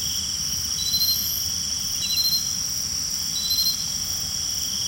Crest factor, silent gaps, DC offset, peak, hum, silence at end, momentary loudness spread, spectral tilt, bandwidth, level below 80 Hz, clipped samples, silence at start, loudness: 14 dB; none; under 0.1%; -10 dBFS; none; 0 s; 4 LU; 0 dB/octave; 16.5 kHz; -48 dBFS; under 0.1%; 0 s; -22 LUFS